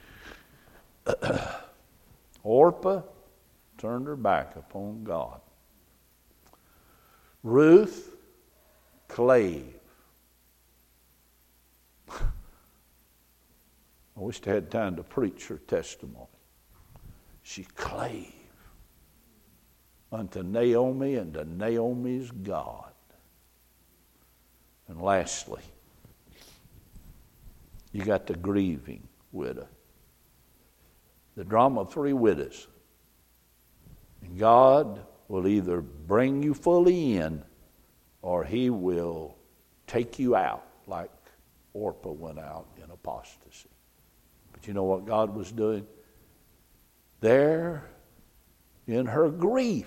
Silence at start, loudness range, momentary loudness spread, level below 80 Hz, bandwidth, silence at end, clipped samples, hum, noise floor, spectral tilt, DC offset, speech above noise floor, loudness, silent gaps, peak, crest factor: 0.2 s; 15 LU; 22 LU; -50 dBFS; 16.5 kHz; 0 s; under 0.1%; none; -64 dBFS; -6.5 dB/octave; under 0.1%; 38 dB; -27 LUFS; none; -6 dBFS; 24 dB